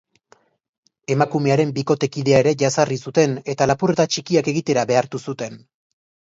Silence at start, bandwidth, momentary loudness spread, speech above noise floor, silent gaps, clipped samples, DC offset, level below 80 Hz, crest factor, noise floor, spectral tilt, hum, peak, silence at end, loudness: 1.1 s; 8 kHz; 11 LU; 38 dB; none; under 0.1%; under 0.1%; -56 dBFS; 18 dB; -57 dBFS; -5.5 dB/octave; none; -2 dBFS; 0.7 s; -19 LUFS